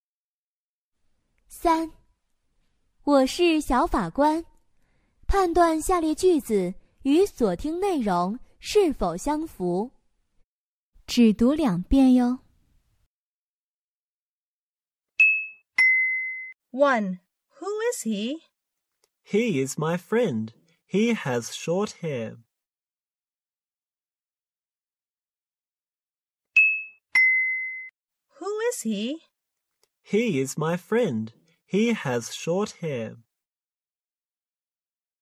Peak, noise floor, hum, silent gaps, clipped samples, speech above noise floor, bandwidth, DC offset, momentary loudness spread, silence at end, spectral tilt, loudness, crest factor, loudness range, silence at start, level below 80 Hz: -8 dBFS; under -90 dBFS; none; 10.44-10.93 s, 13.06-14.77 s, 14.91-14.95 s, 25.47-25.51 s, 26.03-26.07 s; under 0.1%; over 67 dB; 15.5 kHz; under 0.1%; 15 LU; 2.05 s; -5 dB/octave; -24 LUFS; 18 dB; 7 LU; 1.5 s; -44 dBFS